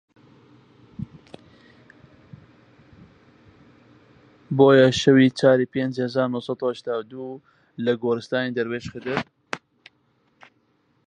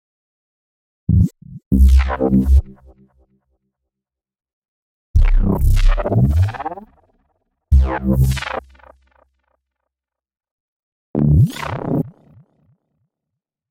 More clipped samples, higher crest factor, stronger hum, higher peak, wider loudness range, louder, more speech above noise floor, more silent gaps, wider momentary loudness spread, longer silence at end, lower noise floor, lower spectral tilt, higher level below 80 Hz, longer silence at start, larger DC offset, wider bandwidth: neither; first, 22 dB vs 14 dB; neither; about the same, -2 dBFS vs -4 dBFS; first, 9 LU vs 5 LU; second, -21 LUFS vs -17 LUFS; second, 45 dB vs 72 dB; second, none vs 1.66-1.71 s, 4.53-4.62 s, 4.68-5.14 s, 10.51-11.14 s; first, 22 LU vs 13 LU; about the same, 1.5 s vs 1.6 s; second, -65 dBFS vs -86 dBFS; second, -6 dB/octave vs -8 dB/octave; second, -60 dBFS vs -20 dBFS; about the same, 1 s vs 1.1 s; neither; second, 9.6 kHz vs 15.5 kHz